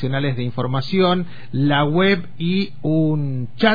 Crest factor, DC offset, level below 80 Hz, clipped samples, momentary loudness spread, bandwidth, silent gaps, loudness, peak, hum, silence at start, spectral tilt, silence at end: 16 dB; 4%; -54 dBFS; under 0.1%; 7 LU; 5 kHz; none; -20 LUFS; -2 dBFS; none; 0 s; -8.5 dB/octave; 0 s